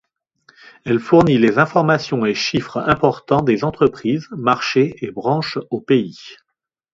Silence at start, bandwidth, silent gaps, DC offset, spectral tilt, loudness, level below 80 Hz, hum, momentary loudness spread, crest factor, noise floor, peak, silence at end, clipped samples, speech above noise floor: 0.85 s; 7.8 kHz; none; under 0.1%; -6.5 dB/octave; -17 LUFS; -50 dBFS; none; 9 LU; 18 dB; -56 dBFS; 0 dBFS; 0.6 s; under 0.1%; 39 dB